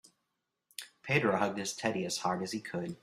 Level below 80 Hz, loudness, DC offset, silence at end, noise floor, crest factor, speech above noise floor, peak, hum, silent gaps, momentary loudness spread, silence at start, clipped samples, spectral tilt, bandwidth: -72 dBFS; -33 LUFS; under 0.1%; 0.05 s; -84 dBFS; 22 dB; 51 dB; -14 dBFS; none; none; 17 LU; 0.8 s; under 0.1%; -4 dB/octave; 15.5 kHz